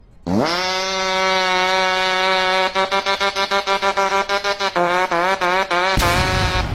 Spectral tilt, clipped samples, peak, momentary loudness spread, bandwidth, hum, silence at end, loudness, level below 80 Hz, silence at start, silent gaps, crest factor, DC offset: -3.5 dB/octave; under 0.1%; -2 dBFS; 3 LU; 16.5 kHz; none; 0 s; -17 LUFS; -34 dBFS; 0.25 s; none; 16 dB; under 0.1%